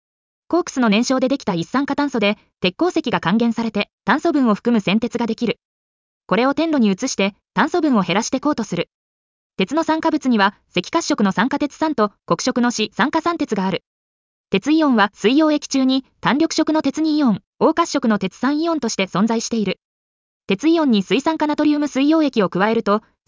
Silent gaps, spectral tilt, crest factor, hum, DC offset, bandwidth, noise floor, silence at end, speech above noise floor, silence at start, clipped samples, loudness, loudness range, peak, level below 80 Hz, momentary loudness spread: 3.93-3.98 s, 5.65-6.21 s, 8.94-9.50 s, 13.87-14.44 s, 17.47-17.53 s, 19.84-20.41 s; -5 dB/octave; 16 dB; none; under 0.1%; 7.6 kHz; under -90 dBFS; 0.3 s; over 72 dB; 0.5 s; under 0.1%; -19 LUFS; 2 LU; -4 dBFS; -58 dBFS; 6 LU